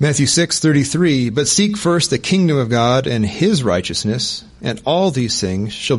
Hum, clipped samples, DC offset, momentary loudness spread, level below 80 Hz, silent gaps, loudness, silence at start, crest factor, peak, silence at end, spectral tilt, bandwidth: none; under 0.1%; under 0.1%; 7 LU; -46 dBFS; none; -16 LUFS; 0 s; 12 dB; -4 dBFS; 0 s; -4.5 dB/octave; 11.5 kHz